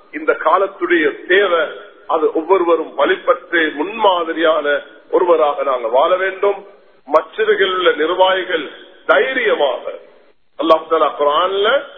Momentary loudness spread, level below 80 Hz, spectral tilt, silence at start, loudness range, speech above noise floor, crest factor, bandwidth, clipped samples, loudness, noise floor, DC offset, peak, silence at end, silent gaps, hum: 8 LU; -66 dBFS; -5.5 dB/octave; 0.15 s; 1 LU; 36 dB; 16 dB; 5.2 kHz; under 0.1%; -15 LUFS; -51 dBFS; 0.3%; 0 dBFS; 0 s; none; none